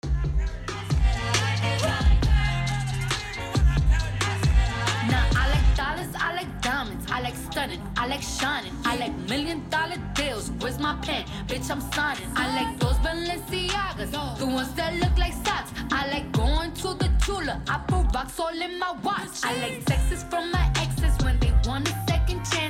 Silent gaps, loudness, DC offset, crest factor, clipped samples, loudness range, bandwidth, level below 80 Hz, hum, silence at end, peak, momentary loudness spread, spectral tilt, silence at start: none; -26 LUFS; under 0.1%; 16 dB; under 0.1%; 4 LU; 16 kHz; -28 dBFS; none; 0 s; -8 dBFS; 6 LU; -4.5 dB/octave; 0.05 s